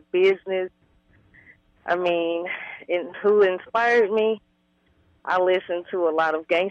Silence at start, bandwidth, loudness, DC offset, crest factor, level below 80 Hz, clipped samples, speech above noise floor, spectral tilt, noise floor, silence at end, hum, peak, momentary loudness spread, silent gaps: 0.15 s; 7.2 kHz; -23 LUFS; under 0.1%; 14 dB; -68 dBFS; under 0.1%; 43 dB; -5.5 dB/octave; -65 dBFS; 0 s; none; -8 dBFS; 12 LU; none